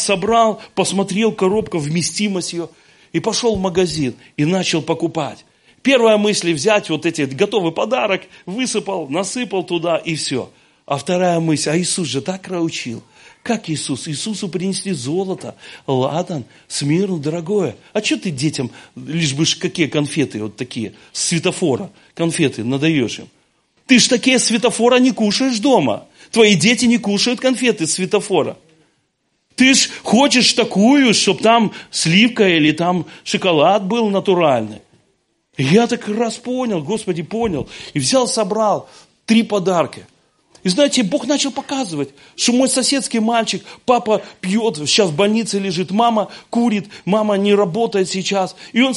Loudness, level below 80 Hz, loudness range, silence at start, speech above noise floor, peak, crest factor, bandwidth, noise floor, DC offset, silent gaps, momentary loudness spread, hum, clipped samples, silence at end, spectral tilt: -17 LUFS; -54 dBFS; 7 LU; 0 s; 50 dB; 0 dBFS; 18 dB; 11.5 kHz; -67 dBFS; under 0.1%; none; 11 LU; none; under 0.1%; 0 s; -4 dB/octave